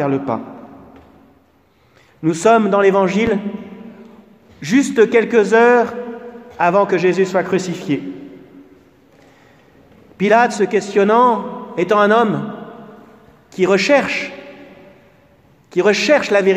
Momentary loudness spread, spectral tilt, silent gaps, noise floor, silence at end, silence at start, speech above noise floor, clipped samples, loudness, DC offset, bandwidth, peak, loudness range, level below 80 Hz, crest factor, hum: 19 LU; -5.5 dB/octave; none; -55 dBFS; 0 s; 0 s; 40 dB; under 0.1%; -15 LUFS; under 0.1%; 12 kHz; 0 dBFS; 5 LU; -58 dBFS; 16 dB; none